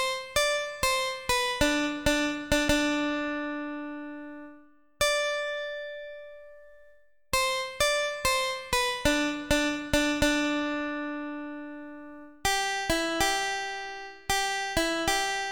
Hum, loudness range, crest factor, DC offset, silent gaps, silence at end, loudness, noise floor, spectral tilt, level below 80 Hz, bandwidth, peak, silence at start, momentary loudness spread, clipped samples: none; 5 LU; 20 dB; 0.2%; none; 0 s; -27 LUFS; -61 dBFS; -2.5 dB/octave; -44 dBFS; 19 kHz; -10 dBFS; 0 s; 14 LU; under 0.1%